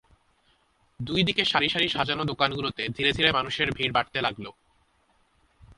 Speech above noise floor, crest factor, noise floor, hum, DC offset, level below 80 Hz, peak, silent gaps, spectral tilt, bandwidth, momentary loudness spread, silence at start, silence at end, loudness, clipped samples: 40 dB; 24 dB; -66 dBFS; none; under 0.1%; -54 dBFS; -6 dBFS; none; -4.5 dB/octave; 11.5 kHz; 8 LU; 1 s; 0.05 s; -25 LUFS; under 0.1%